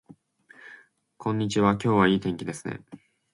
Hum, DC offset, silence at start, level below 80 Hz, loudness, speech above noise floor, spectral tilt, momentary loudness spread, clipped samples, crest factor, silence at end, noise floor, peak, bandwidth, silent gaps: none; under 0.1%; 0.65 s; -56 dBFS; -25 LUFS; 31 dB; -6 dB/octave; 20 LU; under 0.1%; 22 dB; 0.35 s; -56 dBFS; -6 dBFS; 11.5 kHz; none